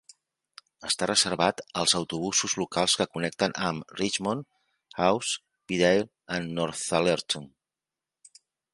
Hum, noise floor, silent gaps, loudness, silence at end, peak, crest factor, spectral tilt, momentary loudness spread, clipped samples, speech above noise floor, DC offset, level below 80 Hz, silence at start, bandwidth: none; -90 dBFS; none; -27 LUFS; 1.25 s; -6 dBFS; 24 dB; -3 dB/octave; 9 LU; under 0.1%; 63 dB; under 0.1%; -62 dBFS; 0.8 s; 11.5 kHz